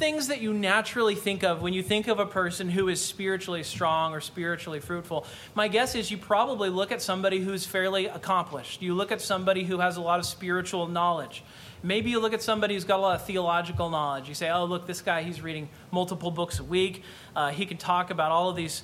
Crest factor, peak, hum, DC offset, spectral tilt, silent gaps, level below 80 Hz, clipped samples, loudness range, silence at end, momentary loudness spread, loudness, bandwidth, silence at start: 18 dB; -10 dBFS; none; under 0.1%; -4 dB/octave; none; -58 dBFS; under 0.1%; 3 LU; 0 s; 8 LU; -28 LUFS; 16.5 kHz; 0 s